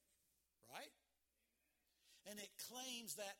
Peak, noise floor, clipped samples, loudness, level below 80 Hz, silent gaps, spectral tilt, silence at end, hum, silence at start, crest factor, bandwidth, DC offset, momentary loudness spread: -34 dBFS; -87 dBFS; under 0.1%; -53 LUFS; under -90 dBFS; none; -1 dB/octave; 0 s; none; 0.65 s; 24 dB; 18 kHz; under 0.1%; 12 LU